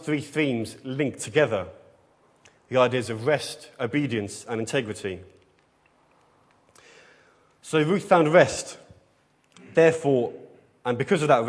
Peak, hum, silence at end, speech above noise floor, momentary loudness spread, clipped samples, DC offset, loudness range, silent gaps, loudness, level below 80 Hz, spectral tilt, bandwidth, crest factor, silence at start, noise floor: -2 dBFS; none; 0 s; 40 dB; 15 LU; under 0.1%; under 0.1%; 10 LU; none; -24 LUFS; -66 dBFS; -5.5 dB/octave; 11 kHz; 22 dB; 0 s; -64 dBFS